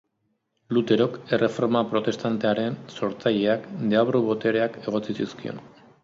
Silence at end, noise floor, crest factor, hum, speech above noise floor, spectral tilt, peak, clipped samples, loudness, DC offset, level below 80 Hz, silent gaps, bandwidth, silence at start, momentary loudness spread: 0.35 s; -74 dBFS; 18 dB; none; 50 dB; -7 dB/octave; -6 dBFS; under 0.1%; -24 LUFS; under 0.1%; -66 dBFS; none; 7.6 kHz; 0.7 s; 9 LU